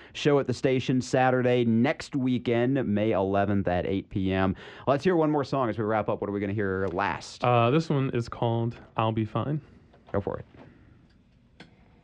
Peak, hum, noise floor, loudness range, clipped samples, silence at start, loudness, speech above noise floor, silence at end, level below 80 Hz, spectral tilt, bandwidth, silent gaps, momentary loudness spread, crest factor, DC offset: -10 dBFS; none; -59 dBFS; 6 LU; under 0.1%; 0 s; -27 LUFS; 34 dB; 0.4 s; -56 dBFS; -7 dB/octave; 9.4 kHz; none; 7 LU; 18 dB; under 0.1%